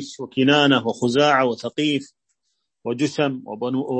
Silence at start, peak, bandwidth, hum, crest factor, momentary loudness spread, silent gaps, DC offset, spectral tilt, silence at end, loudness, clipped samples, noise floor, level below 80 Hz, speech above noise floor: 0 s; -2 dBFS; 8.8 kHz; none; 20 dB; 12 LU; none; under 0.1%; -5 dB/octave; 0 s; -20 LUFS; under 0.1%; -76 dBFS; -68 dBFS; 55 dB